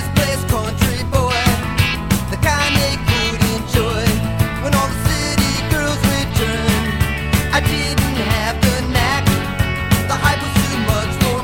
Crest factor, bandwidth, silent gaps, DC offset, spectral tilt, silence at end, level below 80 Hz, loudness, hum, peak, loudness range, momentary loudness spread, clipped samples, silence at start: 16 dB; 17 kHz; none; under 0.1%; -4.5 dB/octave; 0 s; -26 dBFS; -17 LUFS; none; 0 dBFS; 1 LU; 3 LU; under 0.1%; 0 s